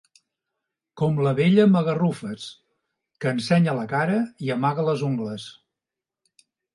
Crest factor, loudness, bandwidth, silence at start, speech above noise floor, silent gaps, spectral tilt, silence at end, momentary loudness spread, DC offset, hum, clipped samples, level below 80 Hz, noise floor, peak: 18 dB; -22 LUFS; 11.5 kHz; 0.95 s; 66 dB; none; -7.5 dB/octave; 1.25 s; 16 LU; under 0.1%; none; under 0.1%; -66 dBFS; -88 dBFS; -6 dBFS